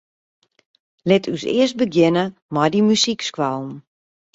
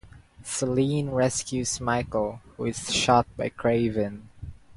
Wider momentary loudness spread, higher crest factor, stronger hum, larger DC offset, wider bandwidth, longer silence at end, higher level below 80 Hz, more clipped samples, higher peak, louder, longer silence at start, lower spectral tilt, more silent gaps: about the same, 12 LU vs 11 LU; about the same, 18 dB vs 20 dB; neither; neither; second, 8 kHz vs 11.5 kHz; first, 0.55 s vs 0.05 s; second, -60 dBFS vs -50 dBFS; neither; first, -2 dBFS vs -6 dBFS; first, -19 LUFS vs -26 LUFS; first, 1.05 s vs 0.05 s; about the same, -5 dB/octave vs -4.5 dB/octave; first, 2.42-2.49 s vs none